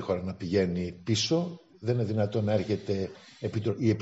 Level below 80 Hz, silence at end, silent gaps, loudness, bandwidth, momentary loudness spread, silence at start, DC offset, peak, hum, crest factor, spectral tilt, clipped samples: -64 dBFS; 0 s; none; -30 LUFS; 8 kHz; 8 LU; 0 s; under 0.1%; -12 dBFS; none; 18 dB; -6 dB/octave; under 0.1%